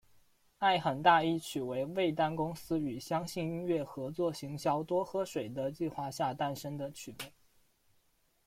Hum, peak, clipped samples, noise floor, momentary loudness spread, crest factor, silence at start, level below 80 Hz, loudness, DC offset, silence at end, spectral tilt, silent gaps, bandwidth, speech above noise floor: none; -12 dBFS; under 0.1%; -72 dBFS; 12 LU; 22 dB; 0.6 s; -68 dBFS; -34 LUFS; under 0.1%; 1.15 s; -5.5 dB/octave; none; 16.5 kHz; 39 dB